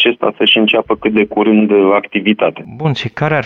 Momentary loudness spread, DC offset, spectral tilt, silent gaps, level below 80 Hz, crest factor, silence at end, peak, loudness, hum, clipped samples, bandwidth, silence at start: 8 LU; under 0.1%; -7 dB/octave; none; -50 dBFS; 12 dB; 0 s; 0 dBFS; -12 LUFS; none; under 0.1%; 6.8 kHz; 0 s